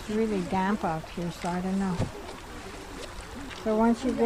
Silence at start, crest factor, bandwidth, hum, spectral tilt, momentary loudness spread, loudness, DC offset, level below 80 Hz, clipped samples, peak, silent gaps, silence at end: 0 s; 16 dB; 15.5 kHz; none; -6.5 dB/octave; 16 LU; -29 LUFS; under 0.1%; -46 dBFS; under 0.1%; -12 dBFS; none; 0 s